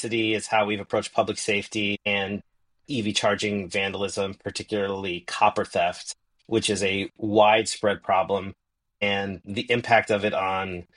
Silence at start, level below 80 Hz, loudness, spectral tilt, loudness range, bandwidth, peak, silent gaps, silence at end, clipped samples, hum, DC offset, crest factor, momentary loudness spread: 0 s; -60 dBFS; -25 LUFS; -4 dB/octave; 3 LU; 11 kHz; -4 dBFS; none; 0.15 s; under 0.1%; none; under 0.1%; 20 dB; 10 LU